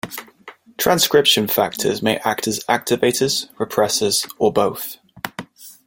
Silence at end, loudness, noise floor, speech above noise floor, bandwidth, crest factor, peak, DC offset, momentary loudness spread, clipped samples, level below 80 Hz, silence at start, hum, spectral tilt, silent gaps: 0.15 s; -18 LUFS; -44 dBFS; 26 dB; 17 kHz; 18 dB; -2 dBFS; under 0.1%; 17 LU; under 0.1%; -56 dBFS; 0.05 s; none; -3 dB/octave; none